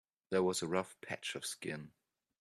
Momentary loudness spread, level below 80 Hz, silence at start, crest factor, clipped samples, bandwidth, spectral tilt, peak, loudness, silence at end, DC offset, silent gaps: 11 LU; -76 dBFS; 0.3 s; 22 dB; under 0.1%; 13.5 kHz; -4 dB/octave; -18 dBFS; -38 LUFS; 0.5 s; under 0.1%; none